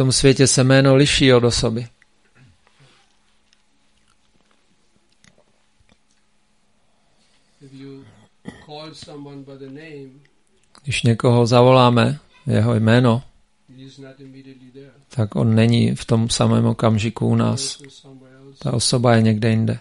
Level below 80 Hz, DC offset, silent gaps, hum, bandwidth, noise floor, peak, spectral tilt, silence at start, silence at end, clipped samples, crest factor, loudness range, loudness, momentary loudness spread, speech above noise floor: -44 dBFS; under 0.1%; none; none; 11.5 kHz; -64 dBFS; 0 dBFS; -5.5 dB/octave; 0 s; 0 s; under 0.1%; 20 dB; 22 LU; -17 LUFS; 24 LU; 48 dB